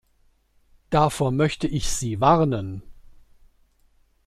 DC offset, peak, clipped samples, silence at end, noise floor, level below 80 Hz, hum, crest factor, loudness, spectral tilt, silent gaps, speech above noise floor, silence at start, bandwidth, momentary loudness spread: under 0.1%; -4 dBFS; under 0.1%; 1.25 s; -62 dBFS; -40 dBFS; none; 20 dB; -22 LUFS; -5.5 dB/octave; none; 41 dB; 0.9 s; 15 kHz; 11 LU